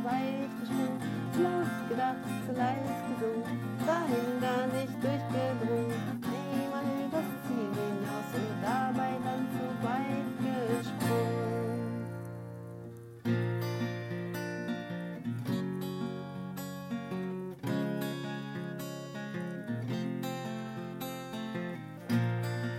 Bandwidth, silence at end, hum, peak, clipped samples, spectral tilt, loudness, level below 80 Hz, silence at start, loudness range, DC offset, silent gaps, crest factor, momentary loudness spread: 16 kHz; 0 s; none; -18 dBFS; under 0.1%; -6.5 dB/octave; -34 LUFS; -72 dBFS; 0 s; 5 LU; under 0.1%; none; 16 dB; 9 LU